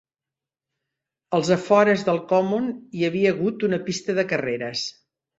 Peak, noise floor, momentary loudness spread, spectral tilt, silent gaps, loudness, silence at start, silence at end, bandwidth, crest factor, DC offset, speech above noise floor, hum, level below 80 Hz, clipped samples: -4 dBFS; -89 dBFS; 9 LU; -5.5 dB/octave; none; -22 LUFS; 1.3 s; 0.5 s; 8 kHz; 20 dB; under 0.1%; 68 dB; none; -66 dBFS; under 0.1%